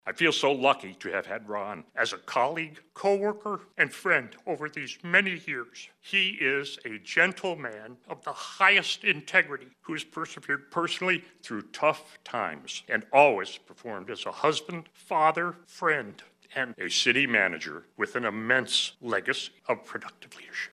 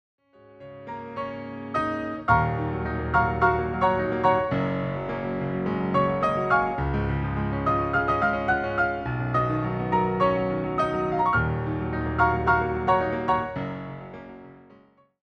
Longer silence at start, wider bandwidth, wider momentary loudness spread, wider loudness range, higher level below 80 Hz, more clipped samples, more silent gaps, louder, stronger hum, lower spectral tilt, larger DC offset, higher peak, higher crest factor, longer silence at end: second, 0.05 s vs 0.6 s; first, 14 kHz vs 8.8 kHz; first, 16 LU vs 11 LU; about the same, 4 LU vs 2 LU; second, -80 dBFS vs -40 dBFS; neither; neither; about the same, -27 LUFS vs -25 LUFS; neither; second, -3 dB/octave vs -8.5 dB/octave; neither; about the same, -4 dBFS vs -6 dBFS; first, 24 dB vs 18 dB; second, 0.05 s vs 0.7 s